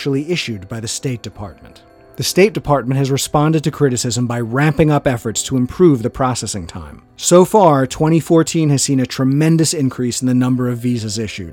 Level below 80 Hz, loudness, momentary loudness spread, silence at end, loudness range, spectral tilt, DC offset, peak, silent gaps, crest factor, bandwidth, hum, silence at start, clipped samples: -42 dBFS; -15 LUFS; 11 LU; 0 s; 4 LU; -5.5 dB/octave; under 0.1%; 0 dBFS; none; 16 dB; 17.5 kHz; none; 0 s; under 0.1%